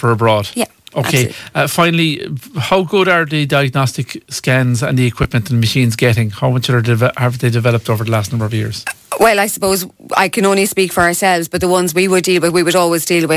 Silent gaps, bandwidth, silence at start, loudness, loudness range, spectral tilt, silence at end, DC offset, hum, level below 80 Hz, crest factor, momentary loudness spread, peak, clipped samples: none; 16 kHz; 0 s; -14 LUFS; 2 LU; -5 dB/octave; 0 s; under 0.1%; none; -42 dBFS; 14 dB; 7 LU; 0 dBFS; under 0.1%